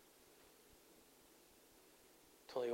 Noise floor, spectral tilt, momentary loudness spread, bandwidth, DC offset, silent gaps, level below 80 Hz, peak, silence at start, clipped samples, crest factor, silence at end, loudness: -68 dBFS; -4 dB/octave; 15 LU; 16 kHz; under 0.1%; none; -82 dBFS; -30 dBFS; 0.3 s; under 0.1%; 22 dB; 0 s; -57 LUFS